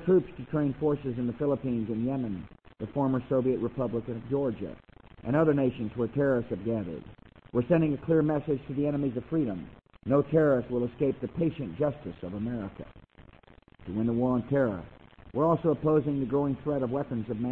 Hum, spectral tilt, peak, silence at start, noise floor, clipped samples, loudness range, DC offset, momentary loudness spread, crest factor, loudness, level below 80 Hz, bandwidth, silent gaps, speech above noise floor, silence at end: none; -11 dB/octave; -12 dBFS; 0 s; -56 dBFS; under 0.1%; 4 LU; under 0.1%; 13 LU; 18 dB; -29 LUFS; -54 dBFS; 4.2 kHz; none; 28 dB; 0 s